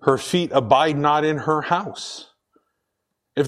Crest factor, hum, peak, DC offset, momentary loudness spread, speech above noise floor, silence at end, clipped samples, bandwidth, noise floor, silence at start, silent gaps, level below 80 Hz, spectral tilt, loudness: 20 dB; none; -2 dBFS; under 0.1%; 15 LU; 58 dB; 0 s; under 0.1%; 14 kHz; -78 dBFS; 0 s; none; -62 dBFS; -5 dB/octave; -20 LUFS